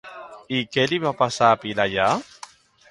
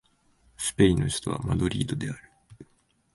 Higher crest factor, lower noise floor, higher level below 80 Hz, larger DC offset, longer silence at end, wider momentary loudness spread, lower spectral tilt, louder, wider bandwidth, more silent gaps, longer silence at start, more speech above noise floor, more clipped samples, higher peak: about the same, 20 dB vs 22 dB; second, -46 dBFS vs -67 dBFS; second, -58 dBFS vs -44 dBFS; neither; first, 0.65 s vs 0.5 s; first, 18 LU vs 12 LU; about the same, -4.5 dB/octave vs -5.5 dB/octave; first, -21 LUFS vs -27 LUFS; about the same, 11.5 kHz vs 12 kHz; neither; second, 0.05 s vs 0.6 s; second, 25 dB vs 42 dB; neither; first, -2 dBFS vs -6 dBFS